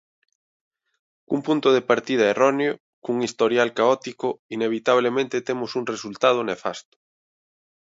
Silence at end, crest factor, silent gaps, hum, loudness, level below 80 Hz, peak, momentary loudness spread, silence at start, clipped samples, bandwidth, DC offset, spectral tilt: 1.1 s; 20 dB; 2.80-3.02 s, 4.39-4.49 s; none; -22 LUFS; -72 dBFS; -4 dBFS; 9 LU; 1.3 s; under 0.1%; 7.8 kHz; under 0.1%; -4.5 dB/octave